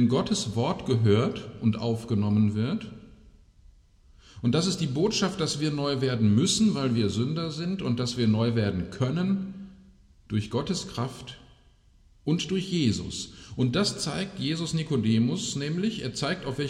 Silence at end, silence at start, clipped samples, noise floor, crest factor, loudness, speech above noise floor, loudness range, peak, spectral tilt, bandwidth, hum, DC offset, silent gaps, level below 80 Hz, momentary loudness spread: 0 s; 0 s; under 0.1%; -58 dBFS; 16 dB; -27 LUFS; 32 dB; 5 LU; -10 dBFS; -5.5 dB/octave; 12 kHz; none; under 0.1%; none; -54 dBFS; 9 LU